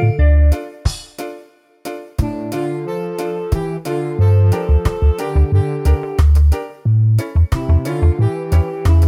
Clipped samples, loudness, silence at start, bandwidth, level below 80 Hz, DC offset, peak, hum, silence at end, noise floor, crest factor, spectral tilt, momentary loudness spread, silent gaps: under 0.1%; -17 LUFS; 0 s; 14.5 kHz; -18 dBFS; under 0.1%; -2 dBFS; none; 0 s; -43 dBFS; 14 dB; -8 dB/octave; 10 LU; none